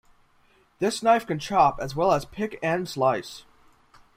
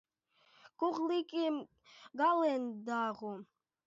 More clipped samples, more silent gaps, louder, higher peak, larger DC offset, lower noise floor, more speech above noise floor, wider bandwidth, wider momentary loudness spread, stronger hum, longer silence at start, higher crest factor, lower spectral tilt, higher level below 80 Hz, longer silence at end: neither; neither; first, -24 LUFS vs -35 LUFS; first, -8 dBFS vs -22 dBFS; neither; second, -61 dBFS vs -72 dBFS; about the same, 37 dB vs 37 dB; first, 16 kHz vs 7.6 kHz; second, 10 LU vs 15 LU; neither; about the same, 0.8 s vs 0.8 s; about the same, 18 dB vs 16 dB; first, -5 dB/octave vs -3 dB/octave; first, -52 dBFS vs -88 dBFS; first, 0.75 s vs 0.4 s